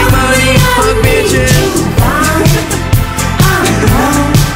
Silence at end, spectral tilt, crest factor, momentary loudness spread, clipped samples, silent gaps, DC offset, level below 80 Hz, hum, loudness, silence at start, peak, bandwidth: 0 s; -4.5 dB/octave; 8 dB; 4 LU; under 0.1%; none; 0.4%; -18 dBFS; none; -9 LUFS; 0 s; 0 dBFS; 16.5 kHz